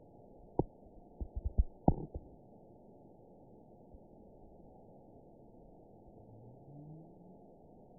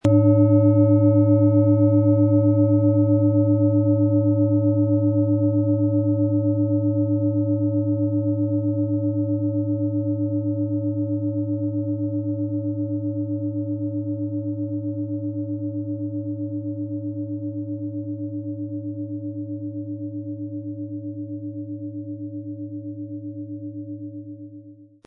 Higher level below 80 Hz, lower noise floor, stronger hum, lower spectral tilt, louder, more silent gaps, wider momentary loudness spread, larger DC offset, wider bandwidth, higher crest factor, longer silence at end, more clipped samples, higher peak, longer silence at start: first, -48 dBFS vs -66 dBFS; first, -59 dBFS vs -45 dBFS; neither; second, -5 dB/octave vs -12.5 dB/octave; second, -40 LUFS vs -22 LUFS; neither; first, 22 LU vs 16 LU; neither; second, 1 kHz vs 2.3 kHz; first, 32 dB vs 16 dB; first, 0.65 s vs 0.25 s; neither; second, -10 dBFS vs -6 dBFS; first, 0.6 s vs 0.05 s